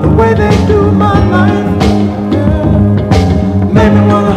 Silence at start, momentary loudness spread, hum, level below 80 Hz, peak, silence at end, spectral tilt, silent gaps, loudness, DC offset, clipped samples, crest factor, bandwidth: 0 s; 4 LU; none; -20 dBFS; 0 dBFS; 0 s; -8 dB/octave; none; -9 LUFS; under 0.1%; 1%; 8 dB; 9.6 kHz